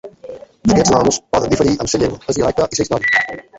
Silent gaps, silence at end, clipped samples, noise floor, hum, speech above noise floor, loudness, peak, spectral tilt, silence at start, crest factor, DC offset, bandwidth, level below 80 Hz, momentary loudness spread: none; 0 s; under 0.1%; -35 dBFS; none; 20 dB; -15 LUFS; -2 dBFS; -4 dB/octave; 0.05 s; 16 dB; under 0.1%; 8.2 kHz; -38 dBFS; 8 LU